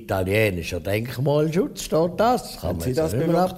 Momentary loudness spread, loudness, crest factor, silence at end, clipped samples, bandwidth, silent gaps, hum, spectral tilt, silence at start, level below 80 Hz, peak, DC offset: 6 LU; -23 LUFS; 14 dB; 0 s; under 0.1%; 16 kHz; none; none; -6 dB/octave; 0 s; -44 dBFS; -8 dBFS; under 0.1%